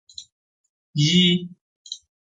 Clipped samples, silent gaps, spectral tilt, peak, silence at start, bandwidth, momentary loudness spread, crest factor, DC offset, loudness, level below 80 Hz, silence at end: under 0.1%; 0.32-0.93 s, 1.61-1.85 s; -4.5 dB/octave; -6 dBFS; 0.2 s; 9.2 kHz; 24 LU; 18 dB; under 0.1%; -19 LUFS; -64 dBFS; 0.35 s